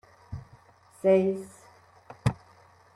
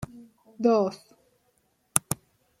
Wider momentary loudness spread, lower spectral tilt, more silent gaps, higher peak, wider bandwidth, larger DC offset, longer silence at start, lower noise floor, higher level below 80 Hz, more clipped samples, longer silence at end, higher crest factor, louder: first, 22 LU vs 17 LU; first, -8 dB/octave vs -4.5 dB/octave; neither; second, -12 dBFS vs 0 dBFS; second, 12 kHz vs 16.5 kHz; neither; first, 0.3 s vs 0 s; second, -57 dBFS vs -70 dBFS; first, -54 dBFS vs -62 dBFS; neither; first, 0.6 s vs 0.45 s; second, 20 dB vs 30 dB; about the same, -27 LUFS vs -26 LUFS